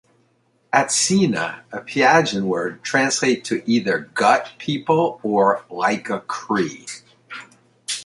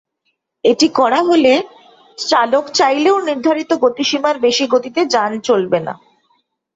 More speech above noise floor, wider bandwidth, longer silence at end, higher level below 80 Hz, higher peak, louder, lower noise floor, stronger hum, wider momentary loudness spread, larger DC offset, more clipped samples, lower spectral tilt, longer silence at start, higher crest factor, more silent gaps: second, 43 dB vs 55 dB; first, 11.5 kHz vs 8 kHz; second, 0 s vs 0.8 s; about the same, -64 dBFS vs -62 dBFS; about the same, -2 dBFS vs -2 dBFS; second, -20 LUFS vs -14 LUFS; second, -63 dBFS vs -69 dBFS; neither; first, 18 LU vs 6 LU; neither; neither; about the same, -3.5 dB/octave vs -3.5 dB/octave; about the same, 0.75 s vs 0.65 s; first, 20 dB vs 14 dB; neither